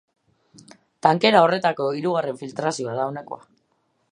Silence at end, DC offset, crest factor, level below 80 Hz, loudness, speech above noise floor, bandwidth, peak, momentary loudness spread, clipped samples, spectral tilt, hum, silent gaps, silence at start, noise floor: 0.75 s; under 0.1%; 22 dB; -74 dBFS; -21 LUFS; 48 dB; 10.5 kHz; 0 dBFS; 16 LU; under 0.1%; -5 dB/octave; none; none; 1.05 s; -69 dBFS